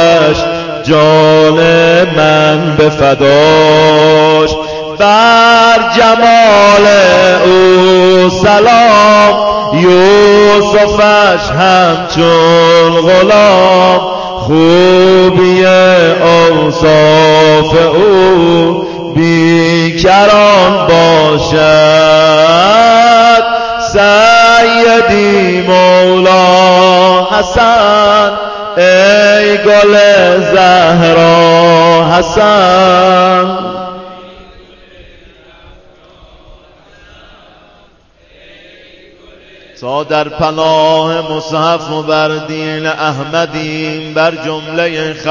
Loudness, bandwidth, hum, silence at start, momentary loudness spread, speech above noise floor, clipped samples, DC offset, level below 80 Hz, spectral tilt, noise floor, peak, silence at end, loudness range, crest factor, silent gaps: -6 LUFS; 8 kHz; none; 0 s; 10 LU; 38 dB; 0.6%; under 0.1%; -36 dBFS; -5 dB/octave; -44 dBFS; 0 dBFS; 0 s; 8 LU; 6 dB; none